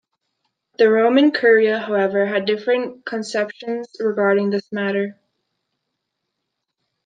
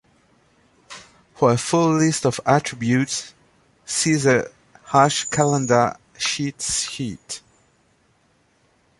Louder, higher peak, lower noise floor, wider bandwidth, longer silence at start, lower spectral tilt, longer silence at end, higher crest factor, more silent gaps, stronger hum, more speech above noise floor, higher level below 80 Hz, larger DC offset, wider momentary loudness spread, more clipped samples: about the same, -19 LUFS vs -20 LUFS; about the same, -2 dBFS vs -2 dBFS; first, -78 dBFS vs -62 dBFS; second, 9.2 kHz vs 11.5 kHz; about the same, 0.8 s vs 0.9 s; about the same, -5.5 dB/octave vs -4.5 dB/octave; first, 1.95 s vs 1.6 s; about the same, 18 dB vs 20 dB; neither; neither; first, 60 dB vs 42 dB; second, -74 dBFS vs -56 dBFS; neither; second, 12 LU vs 17 LU; neither